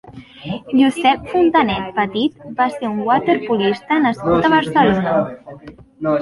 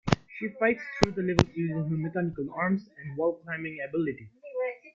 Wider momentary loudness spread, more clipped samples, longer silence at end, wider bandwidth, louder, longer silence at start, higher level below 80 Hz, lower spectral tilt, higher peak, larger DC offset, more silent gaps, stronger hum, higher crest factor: first, 12 LU vs 9 LU; neither; about the same, 0 s vs 0.05 s; first, 11.5 kHz vs 7.6 kHz; first, -17 LUFS vs -30 LUFS; about the same, 0.05 s vs 0.05 s; about the same, -48 dBFS vs -52 dBFS; about the same, -6.5 dB/octave vs -6.5 dB/octave; about the same, -2 dBFS vs -2 dBFS; neither; neither; neither; second, 16 dB vs 26 dB